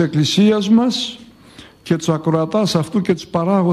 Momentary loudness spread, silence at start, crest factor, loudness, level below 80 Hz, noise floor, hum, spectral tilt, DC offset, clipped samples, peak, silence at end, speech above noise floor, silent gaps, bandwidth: 9 LU; 0 s; 14 dB; -17 LUFS; -54 dBFS; -42 dBFS; none; -6 dB/octave; under 0.1%; under 0.1%; -2 dBFS; 0 s; 27 dB; none; 13.5 kHz